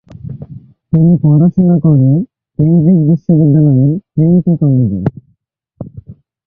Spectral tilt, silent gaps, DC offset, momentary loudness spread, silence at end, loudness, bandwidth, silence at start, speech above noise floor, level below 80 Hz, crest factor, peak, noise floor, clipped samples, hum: -14.5 dB/octave; none; under 0.1%; 20 LU; 0.35 s; -10 LUFS; 1.8 kHz; 0.25 s; 51 dB; -42 dBFS; 10 dB; 0 dBFS; -60 dBFS; under 0.1%; none